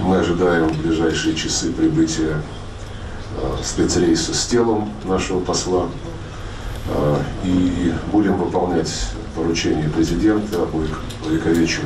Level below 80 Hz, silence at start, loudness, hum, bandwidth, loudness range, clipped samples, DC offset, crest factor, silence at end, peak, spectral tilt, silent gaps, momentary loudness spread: -32 dBFS; 0 s; -19 LUFS; none; 13 kHz; 2 LU; under 0.1%; under 0.1%; 12 dB; 0 s; -8 dBFS; -5 dB/octave; none; 13 LU